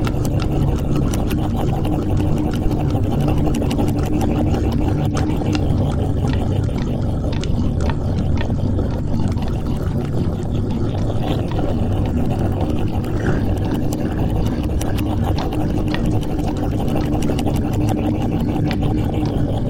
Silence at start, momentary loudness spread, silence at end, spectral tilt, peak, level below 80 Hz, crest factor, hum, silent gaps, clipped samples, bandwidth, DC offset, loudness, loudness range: 0 s; 3 LU; 0 s; -7.5 dB/octave; -2 dBFS; -24 dBFS; 16 dB; none; none; under 0.1%; 16.5 kHz; under 0.1%; -20 LUFS; 2 LU